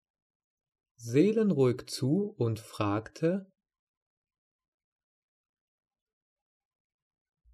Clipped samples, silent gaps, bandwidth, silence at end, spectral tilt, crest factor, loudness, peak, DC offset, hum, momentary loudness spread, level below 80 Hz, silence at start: under 0.1%; none; 13 kHz; 4.1 s; -7 dB/octave; 20 dB; -30 LUFS; -12 dBFS; under 0.1%; none; 8 LU; -72 dBFS; 1 s